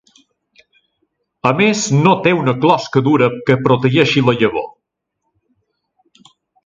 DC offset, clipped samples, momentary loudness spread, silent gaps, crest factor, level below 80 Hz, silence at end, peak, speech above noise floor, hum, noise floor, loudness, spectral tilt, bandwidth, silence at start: under 0.1%; under 0.1%; 5 LU; none; 16 dB; -56 dBFS; 2 s; 0 dBFS; 61 dB; none; -75 dBFS; -14 LUFS; -5.5 dB/octave; 9 kHz; 1.45 s